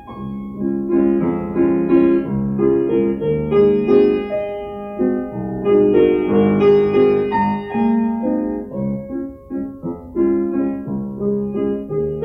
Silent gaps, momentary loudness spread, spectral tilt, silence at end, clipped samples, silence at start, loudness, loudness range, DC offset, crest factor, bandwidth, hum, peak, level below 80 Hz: none; 13 LU; -10.5 dB/octave; 0 s; under 0.1%; 0 s; -18 LUFS; 6 LU; under 0.1%; 14 dB; 5.4 kHz; none; -2 dBFS; -44 dBFS